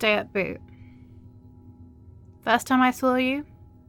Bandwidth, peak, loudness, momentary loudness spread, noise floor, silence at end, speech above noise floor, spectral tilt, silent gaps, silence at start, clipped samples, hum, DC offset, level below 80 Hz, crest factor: 17.5 kHz; -6 dBFS; -24 LUFS; 14 LU; -49 dBFS; 0.45 s; 26 dB; -4.5 dB/octave; none; 0 s; under 0.1%; none; under 0.1%; -56 dBFS; 22 dB